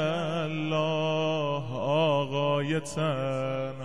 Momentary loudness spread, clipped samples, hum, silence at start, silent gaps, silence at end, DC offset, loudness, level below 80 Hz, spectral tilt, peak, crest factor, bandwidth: 5 LU; under 0.1%; none; 0 s; none; 0 s; 0.5%; -28 LUFS; -64 dBFS; -6 dB/octave; -14 dBFS; 14 dB; 11.5 kHz